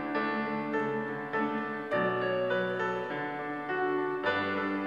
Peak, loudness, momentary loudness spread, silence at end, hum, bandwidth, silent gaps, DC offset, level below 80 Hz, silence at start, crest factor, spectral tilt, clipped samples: -16 dBFS; -31 LUFS; 5 LU; 0 s; none; 7.8 kHz; none; under 0.1%; -72 dBFS; 0 s; 16 dB; -7 dB/octave; under 0.1%